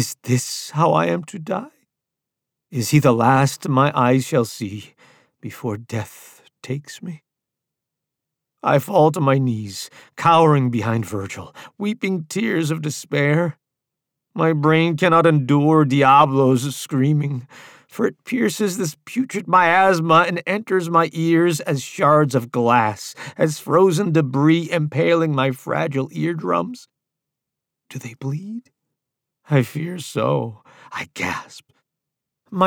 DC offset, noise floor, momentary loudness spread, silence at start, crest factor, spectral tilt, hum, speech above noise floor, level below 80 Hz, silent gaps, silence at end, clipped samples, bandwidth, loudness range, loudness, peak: under 0.1%; -84 dBFS; 16 LU; 0 s; 16 dB; -6 dB/octave; none; 65 dB; -64 dBFS; none; 0 s; under 0.1%; 18.5 kHz; 11 LU; -19 LUFS; -2 dBFS